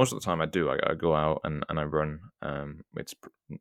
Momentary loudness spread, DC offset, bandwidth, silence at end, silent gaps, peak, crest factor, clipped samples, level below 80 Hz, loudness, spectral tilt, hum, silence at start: 14 LU; under 0.1%; 17 kHz; 0.05 s; none; -8 dBFS; 22 dB; under 0.1%; -52 dBFS; -30 LUFS; -5.5 dB/octave; none; 0 s